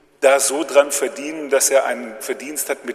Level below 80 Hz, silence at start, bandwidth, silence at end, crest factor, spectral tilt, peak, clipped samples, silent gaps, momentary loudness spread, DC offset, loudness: -70 dBFS; 0.2 s; 15 kHz; 0 s; 18 dB; -0.5 dB/octave; 0 dBFS; under 0.1%; none; 12 LU; under 0.1%; -18 LUFS